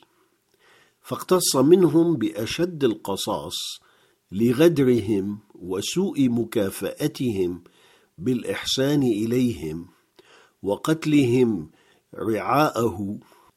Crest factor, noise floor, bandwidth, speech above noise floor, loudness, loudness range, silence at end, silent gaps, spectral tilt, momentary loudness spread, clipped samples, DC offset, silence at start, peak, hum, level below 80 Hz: 20 dB; -65 dBFS; 15.5 kHz; 43 dB; -23 LUFS; 4 LU; 0.35 s; none; -5.5 dB/octave; 15 LU; under 0.1%; under 0.1%; 1.05 s; -4 dBFS; none; -58 dBFS